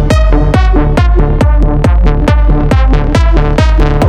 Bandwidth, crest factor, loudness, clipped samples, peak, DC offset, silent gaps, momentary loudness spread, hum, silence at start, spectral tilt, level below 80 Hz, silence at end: 9 kHz; 6 dB; -10 LUFS; under 0.1%; 0 dBFS; under 0.1%; none; 1 LU; none; 0 s; -7.5 dB/octave; -8 dBFS; 0 s